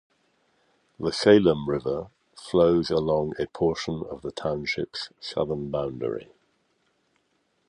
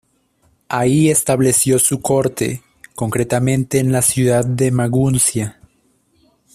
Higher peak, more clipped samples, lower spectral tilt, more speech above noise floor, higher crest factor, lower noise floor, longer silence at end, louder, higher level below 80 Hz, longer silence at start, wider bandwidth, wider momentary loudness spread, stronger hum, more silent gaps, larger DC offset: about the same, -4 dBFS vs -2 dBFS; neither; about the same, -6 dB/octave vs -5 dB/octave; about the same, 46 dB vs 44 dB; first, 22 dB vs 16 dB; first, -71 dBFS vs -60 dBFS; first, 1.45 s vs 1.05 s; second, -25 LUFS vs -15 LUFS; about the same, -52 dBFS vs -48 dBFS; first, 1 s vs 0.7 s; second, 10.5 kHz vs 15.5 kHz; first, 14 LU vs 11 LU; neither; neither; neither